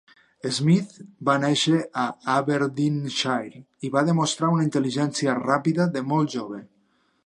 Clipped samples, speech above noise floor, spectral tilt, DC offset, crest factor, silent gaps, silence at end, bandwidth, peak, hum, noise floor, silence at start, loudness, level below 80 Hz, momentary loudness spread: under 0.1%; 43 dB; -5.5 dB/octave; under 0.1%; 20 dB; none; 0.6 s; 11 kHz; -4 dBFS; none; -66 dBFS; 0.45 s; -23 LUFS; -70 dBFS; 10 LU